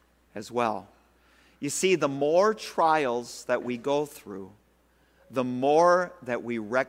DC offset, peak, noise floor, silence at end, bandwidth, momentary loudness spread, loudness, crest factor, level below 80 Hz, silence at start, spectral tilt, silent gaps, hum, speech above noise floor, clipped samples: under 0.1%; -8 dBFS; -64 dBFS; 0 s; 16 kHz; 16 LU; -26 LUFS; 18 dB; -68 dBFS; 0.35 s; -4.5 dB/octave; none; none; 38 dB; under 0.1%